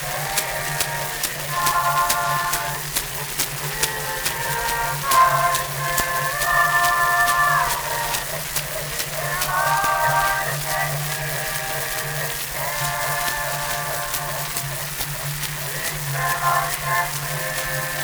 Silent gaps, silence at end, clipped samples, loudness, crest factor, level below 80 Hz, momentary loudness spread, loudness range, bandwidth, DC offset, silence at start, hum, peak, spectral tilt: none; 0 s; under 0.1%; -21 LUFS; 20 dB; -44 dBFS; 7 LU; 5 LU; over 20 kHz; under 0.1%; 0 s; none; -2 dBFS; -2 dB/octave